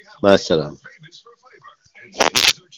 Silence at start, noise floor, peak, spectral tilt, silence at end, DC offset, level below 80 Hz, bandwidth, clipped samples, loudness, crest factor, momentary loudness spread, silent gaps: 0.25 s; -48 dBFS; 0 dBFS; -2.5 dB/octave; 0.25 s; under 0.1%; -54 dBFS; over 20 kHz; 0.2%; -16 LUFS; 20 dB; 16 LU; none